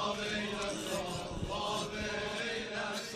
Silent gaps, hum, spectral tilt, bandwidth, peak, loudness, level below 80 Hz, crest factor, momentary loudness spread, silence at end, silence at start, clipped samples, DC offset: none; none; -3.5 dB/octave; 14.5 kHz; -22 dBFS; -36 LUFS; -54 dBFS; 14 dB; 2 LU; 0 s; 0 s; under 0.1%; under 0.1%